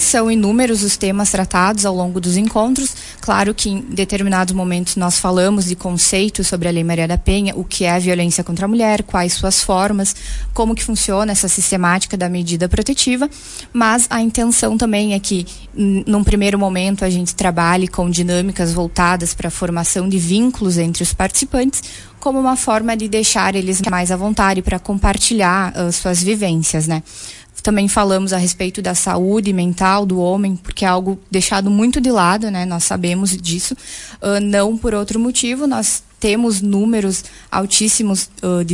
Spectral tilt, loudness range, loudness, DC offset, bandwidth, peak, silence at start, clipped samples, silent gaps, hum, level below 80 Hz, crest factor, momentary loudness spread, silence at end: -4 dB/octave; 1 LU; -16 LUFS; under 0.1%; 11.5 kHz; 0 dBFS; 0 s; under 0.1%; none; none; -30 dBFS; 16 dB; 6 LU; 0 s